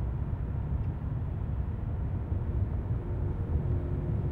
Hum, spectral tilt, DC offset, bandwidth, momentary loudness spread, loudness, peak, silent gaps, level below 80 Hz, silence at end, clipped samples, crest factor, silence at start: none; -11.5 dB/octave; under 0.1%; 3.7 kHz; 3 LU; -33 LUFS; -18 dBFS; none; -36 dBFS; 0 s; under 0.1%; 14 dB; 0 s